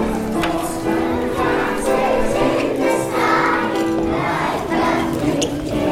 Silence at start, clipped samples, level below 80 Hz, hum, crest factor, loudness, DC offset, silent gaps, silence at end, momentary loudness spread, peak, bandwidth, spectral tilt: 0 s; under 0.1%; -36 dBFS; none; 14 dB; -19 LUFS; under 0.1%; none; 0 s; 4 LU; -4 dBFS; 16 kHz; -5 dB/octave